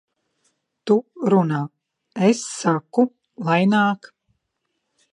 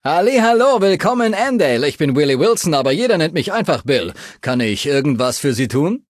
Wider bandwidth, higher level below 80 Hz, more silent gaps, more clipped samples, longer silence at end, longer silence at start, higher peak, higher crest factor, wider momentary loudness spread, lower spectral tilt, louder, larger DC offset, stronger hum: second, 11 kHz vs 14.5 kHz; second, -72 dBFS vs -52 dBFS; neither; neither; first, 1.2 s vs 0.1 s; first, 0.85 s vs 0.05 s; about the same, -4 dBFS vs -2 dBFS; first, 18 dB vs 12 dB; first, 13 LU vs 6 LU; about the same, -6 dB/octave vs -5 dB/octave; second, -20 LUFS vs -16 LUFS; neither; neither